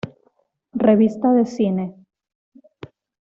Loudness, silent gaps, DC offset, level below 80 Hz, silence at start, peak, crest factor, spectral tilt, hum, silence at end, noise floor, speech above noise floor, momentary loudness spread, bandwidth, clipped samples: -18 LUFS; none; under 0.1%; -62 dBFS; 0.05 s; -4 dBFS; 18 dB; -8.5 dB/octave; none; 1.35 s; -64 dBFS; 47 dB; 17 LU; 7.4 kHz; under 0.1%